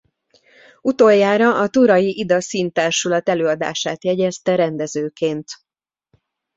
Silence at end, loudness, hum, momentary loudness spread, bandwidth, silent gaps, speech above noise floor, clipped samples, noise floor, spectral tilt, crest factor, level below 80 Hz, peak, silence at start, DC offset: 1 s; -17 LUFS; none; 10 LU; 8 kHz; none; 52 dB; under 0.1%; -69 dBFS; -4.5 dB/octave; 16 dB; -62 dBFS; -2 dBFS; 0.85 s; under 0.1%